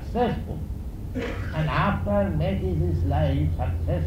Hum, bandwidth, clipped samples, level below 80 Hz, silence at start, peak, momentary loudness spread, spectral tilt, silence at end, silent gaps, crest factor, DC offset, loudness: none; 7.8 kHz; under 0.1%; -32 dBFS; 0 s; -10 dBFS; 10 LU; -8.5 dB/octave; 0 s; none; 14 dB; under 0.1%; -26 LUFS